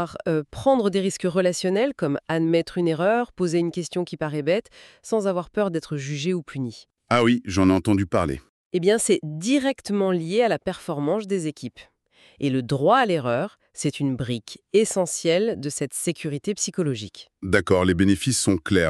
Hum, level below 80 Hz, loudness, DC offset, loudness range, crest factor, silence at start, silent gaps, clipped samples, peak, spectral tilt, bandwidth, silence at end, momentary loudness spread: none; -52 dBFS; -23 LUFS; under 0.1%; 3 LU; 20 dB; 0 s; 8.49-8.71 s; under 0.1%; -4 dBFS; -5 dB/octave; 13.5 kHz; 0 s; 9 LU